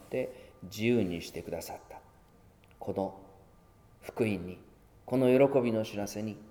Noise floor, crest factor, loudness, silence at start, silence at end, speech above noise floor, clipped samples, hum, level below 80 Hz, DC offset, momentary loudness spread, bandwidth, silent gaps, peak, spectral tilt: -60 dBFS; 20 dB; -31 LUFS; 0 s; 0 s; 29 dB; under 0.1%; none; -62 dBFS; under 0.1%; 22 LU; 19 kHz; none; -12 dBFS; -6.5 dB/octave